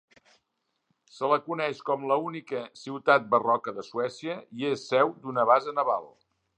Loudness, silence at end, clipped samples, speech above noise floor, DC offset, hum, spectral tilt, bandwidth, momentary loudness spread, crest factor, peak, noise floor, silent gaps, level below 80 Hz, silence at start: -27 LUFS; 0.5 s; under 0.1%; 52 dB; under 0.1%; none; -5.5 dB/octave; 9.4 kHz; 12 LU; 22 dB; -6 dBFS; -79 dBFS; none; -82 dBFS; 1.15 s